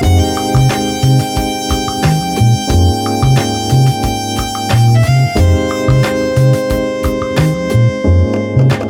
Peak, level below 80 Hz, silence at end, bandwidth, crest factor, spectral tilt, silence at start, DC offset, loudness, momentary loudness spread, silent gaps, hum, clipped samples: 0 dBFS; -24 dBFS; 0 s; 18 kHz; 12 dB; -6 dB/octave; 0 s; under 0.1%; -12 LUFS; 5 LU; none; none; under 0.1%